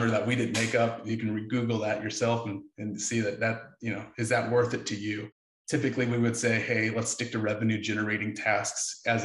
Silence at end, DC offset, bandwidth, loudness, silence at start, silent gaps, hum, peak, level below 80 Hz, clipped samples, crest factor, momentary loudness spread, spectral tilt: 0 s; under 0.1%; 12 kHz; -29 LUFS; 0 s; 5.32-5.65 s; none; -12 dBFS; -68 dBFS; under 0.1%; 18 dB; 9 LU; -4.5 dB/octave